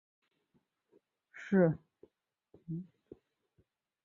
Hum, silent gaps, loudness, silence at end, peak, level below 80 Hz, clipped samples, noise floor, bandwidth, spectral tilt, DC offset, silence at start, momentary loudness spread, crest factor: none; none; -33 LUFS; 1.2 s; -16 dBFS; -74 dBFS; under 0.1%; -78 dBFS; 7 kHz; -9 dB/octave; under 0.1%; 1.35 s; 24 LU; 22 dB